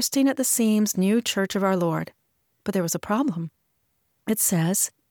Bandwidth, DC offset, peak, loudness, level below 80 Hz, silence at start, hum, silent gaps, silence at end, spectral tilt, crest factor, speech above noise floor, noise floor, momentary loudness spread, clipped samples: over 20 kHz; under 0.1%; -10 dBFS; -23 LUFS; -66 dBFS; 0 s; none; none; 0.25 s; -4 dB/octave; 14 dB; 49 dB; -72 dBFS; 13 LU; under 0.1%